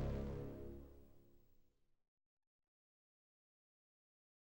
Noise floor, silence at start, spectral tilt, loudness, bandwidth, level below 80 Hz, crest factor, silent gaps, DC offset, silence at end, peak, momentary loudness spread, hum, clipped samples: -73 dBFS; 0 s; -8.5 dB/octave; -50 LUFS; 16 kHz; -58 dBFS; 22 dB; none; under 0.1%; 2.9 s; -32 dBFS; 21 LU; none; under 0.1%